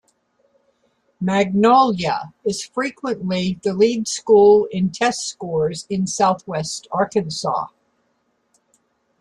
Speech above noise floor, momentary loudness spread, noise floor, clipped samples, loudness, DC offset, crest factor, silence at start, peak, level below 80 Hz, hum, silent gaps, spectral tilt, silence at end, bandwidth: 49 dB; 12 LU; -67 dBFS; under 0.1%; -19 LUFS; under 0.1%; 18 dB; 1.2 s; -2 dBFS; -58 dBFS; none; none; -5 dB/octave; 1.55 s; 11.5 kHz